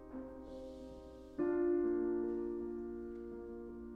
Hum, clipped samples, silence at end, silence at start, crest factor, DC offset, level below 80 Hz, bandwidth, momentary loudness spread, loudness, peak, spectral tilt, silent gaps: none; under 0.1%; 0 s; 0 s; 14 dB; under 0.1%; -60 dBFS; 4.7 kHz; 16 LU; -40 LUFS; -26 dBFS; -8.5 dB/octave; none